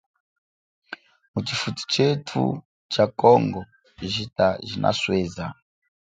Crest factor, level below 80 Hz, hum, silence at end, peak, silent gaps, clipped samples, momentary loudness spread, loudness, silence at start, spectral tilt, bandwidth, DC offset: 22 dB; -54 dBFS; none; 0.6 s; -2 dBFS; 1.28-1.34 s, 2.65-2.89 s; under 0.1%; 18 LU; -23 LUFS; 0.9 s; -5.5 dB/octave; 9.4 kHz; under 0.1%